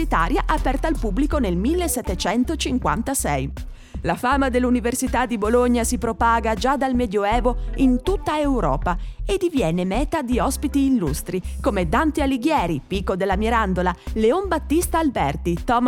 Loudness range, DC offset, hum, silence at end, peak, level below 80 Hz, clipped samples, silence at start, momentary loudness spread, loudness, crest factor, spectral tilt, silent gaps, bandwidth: 2 LU; under 0.1%; none; 0 s; -6 dBFS; -30 dBFS; under 0.1%; 0 s; 5 LU; -21 LUFS; 16 dB; -5 dB/octave; none; 18 kHz